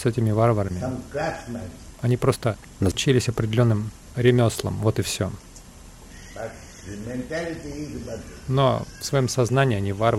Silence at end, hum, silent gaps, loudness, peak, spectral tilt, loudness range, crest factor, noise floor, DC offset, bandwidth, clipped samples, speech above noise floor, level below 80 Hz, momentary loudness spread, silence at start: 0 s; none; none; -24 LUFS; -6 dBFS; -6 dB/octave; 9 LU; 18 dB; -44 dBFS; under 0.1%; 15 kHz; under 0.1%; 21 dB; -46 dBFS; 16 LU; 0 s